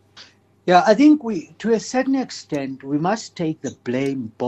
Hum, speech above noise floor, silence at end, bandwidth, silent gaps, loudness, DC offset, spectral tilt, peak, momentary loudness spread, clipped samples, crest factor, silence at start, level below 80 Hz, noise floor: none; 29 dB; 0 s; 8.4 kHz; none; -20 LUFS; under 0.1%; -5.5 dB/octave; -2 dBFS; 13 LU; under 0.1%; 18 dB; 0.15 s; -64 dBFS; -48 dBFS